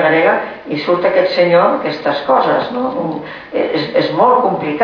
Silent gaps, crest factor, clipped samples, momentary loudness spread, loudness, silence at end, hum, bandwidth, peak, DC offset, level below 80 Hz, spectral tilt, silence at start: none; 12 dB; under 0.1%; 10 LU; -14 LUFS; 0 s; none; 5.4 kHz; -2 dBFS; under 0.1%; -56 dBFS; -7.5 dB/octave; 0 s